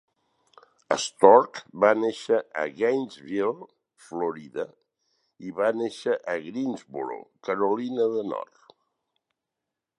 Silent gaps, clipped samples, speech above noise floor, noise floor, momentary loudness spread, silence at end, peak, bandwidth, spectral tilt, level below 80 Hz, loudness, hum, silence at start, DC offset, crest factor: none; under 0.1%; 61 dB; -86 dBFS; 16 LU; 1.55 s; -2 dBFS; 11 kHz; -4.5 dB/octave; -76 dBFS; -25 LUFS; none; 0.9 s; under 0.1%; 24 dB